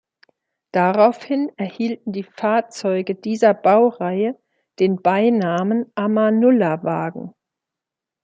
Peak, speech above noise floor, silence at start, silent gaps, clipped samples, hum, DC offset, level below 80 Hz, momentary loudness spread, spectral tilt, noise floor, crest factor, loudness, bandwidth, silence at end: -2 dBFS; 68 dB; 0.75 s; none; under 0.1%; none; under 0.1%; -70 dBFS; 10 LU; -7 dB/octave; -86 dBFS; 16 dB; -19 LUFS; 8.6 kHz; 0.95 s